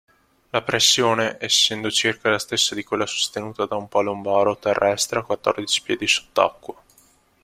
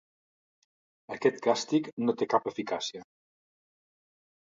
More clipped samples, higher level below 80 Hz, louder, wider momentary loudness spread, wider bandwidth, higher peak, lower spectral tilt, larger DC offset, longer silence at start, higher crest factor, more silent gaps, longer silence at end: neither; first, -60 dBFS vs -78 dBFS; first, -20 LUFS vs -30 LUFS; about the same, 9 LU vs 10 LU; first, 16 kHz vs 7.8 kHz; first, -2 dBFS vs -8 dBFS; second, -2 dB/octave vs -4.5 dB/octave; neither; second, 0.55 s vs 1.1 s; about the same, 22 dB vs 24 dB; second, none vs 1.93-1.97 s; second, 0.7 s vs 1.4 s